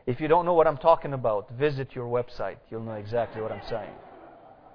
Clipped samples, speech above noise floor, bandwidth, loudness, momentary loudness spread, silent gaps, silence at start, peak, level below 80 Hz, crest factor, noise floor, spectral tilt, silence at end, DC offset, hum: under 0.1%; 24 dB; 5.4 kHz; -27 LUFS; 15 LU; none; 0.05 s; -6 dBFS; -50 dBFS; 22 dB; -50 dBFS; -9 dB/octave; 0.2 s; under 0.1%; none